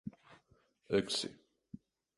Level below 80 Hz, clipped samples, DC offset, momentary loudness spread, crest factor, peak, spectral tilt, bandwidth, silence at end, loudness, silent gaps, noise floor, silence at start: -70 dBFS; under 0.1%; under 0.1%; 23 LU; 22 dB; -20 dBFS; -4 dB/octave; 11.5 kHz; 0.4 s; -36 LUFS; none; -72 dBFS; 0.05 s